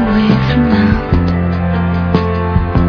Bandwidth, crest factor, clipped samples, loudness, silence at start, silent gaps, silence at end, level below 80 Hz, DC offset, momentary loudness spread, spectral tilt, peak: 5.4 kHz; 12 dB; under 0.1%; -13 LUFS; 0 s; none; 0 s; -22 dBFS; under 0.1%; 4 LU; -9 dB/octave; 0 dBFS